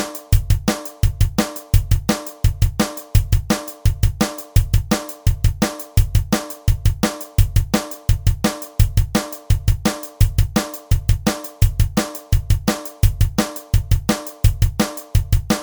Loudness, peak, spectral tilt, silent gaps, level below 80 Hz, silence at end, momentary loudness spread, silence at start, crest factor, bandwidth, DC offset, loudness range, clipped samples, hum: -20 LUFS; 0 dBFS; -5.5 dB/octave; none; -22 dBFS; 0 s; 4 LU; 0 s; 18 dB; over 20 kHz; under 0.1%; 0 LU; under 0.1%; none